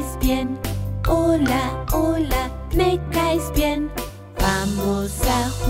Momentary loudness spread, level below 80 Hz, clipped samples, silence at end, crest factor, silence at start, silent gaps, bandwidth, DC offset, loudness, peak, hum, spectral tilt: 7 LU; -28 dBFS; under 0.1%; 0 s; 16 dB; 0 s; none; 16.5 kHz; under 0.1%; -22 LUFS; -6 dBFS; none; -5.5 dB/octave